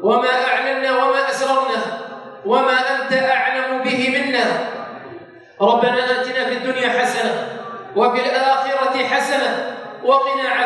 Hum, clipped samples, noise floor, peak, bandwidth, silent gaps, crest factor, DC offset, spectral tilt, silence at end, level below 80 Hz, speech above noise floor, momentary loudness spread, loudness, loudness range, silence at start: none; under 0.1%; -38 dBFS; -2 dBFS; 11.5 kHz; none; 16 dB; under 0.1%; -3.5 dB/octave; 0 s; -74 dBFS; 21 dB; 12 LU; -18 LUFS; 1 LU; 0 s